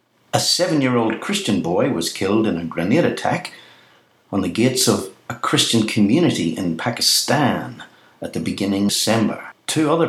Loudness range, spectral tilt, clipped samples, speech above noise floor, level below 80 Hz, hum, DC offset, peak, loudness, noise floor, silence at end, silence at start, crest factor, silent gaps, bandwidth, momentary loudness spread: 3 LU; -4 dB/octave; under 0.1%; 35 dB; -58 dBFS; none; under 0.1%; -2 dBFS; -19 LUFS; -54 dBFS; 0 s; 0.35 s; 18 dB; none; 16.5 kHz; 11 LU